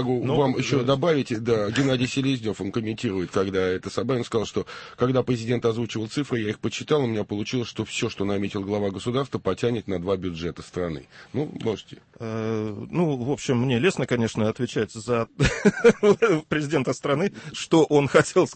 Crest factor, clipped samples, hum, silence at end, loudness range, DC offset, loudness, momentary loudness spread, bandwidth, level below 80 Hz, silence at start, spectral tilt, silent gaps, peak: 18 dB; under 0.1%; none; 0 s; 6 LU; under 0.1%; -24 LUFS; 11 LU; 8.8 kHz; -48 dBFS; 0 s; -6 dB/octave; none; -4 dBFS